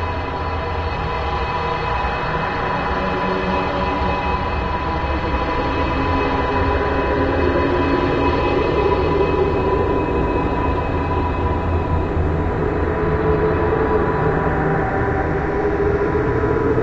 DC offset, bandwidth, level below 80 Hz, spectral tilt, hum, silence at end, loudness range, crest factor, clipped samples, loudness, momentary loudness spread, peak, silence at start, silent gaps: under 0.1%; 7.6 kHz; -28 dBFS; -8 dB/octave; none; 0 s; 3 LU; 14 dB; under 0.1%; -19 LUFS; 4 LU; -6 dBFS; 0 s; none